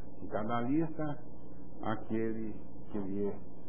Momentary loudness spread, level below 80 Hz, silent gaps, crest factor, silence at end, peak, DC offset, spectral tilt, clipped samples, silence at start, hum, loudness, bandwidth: 16 LU; -58 dBFS; none; 18 dB; 0 s; -18 dBFS; 2%; -7.5 dB/octave; under 0.1%; 0 s; 60 Hz at -55 dBFS; -37 LUFS; 3.5 kHz